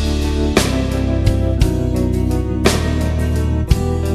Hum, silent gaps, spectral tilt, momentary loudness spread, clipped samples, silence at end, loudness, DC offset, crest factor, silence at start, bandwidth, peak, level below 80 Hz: none; none; -6 dB/octave; 3 LU; under 0.1%; 0 s; -17 LUFS; under 0.1%; 16 dB; 0 s; 14 kHz; 0 dBFS; -20 dBFS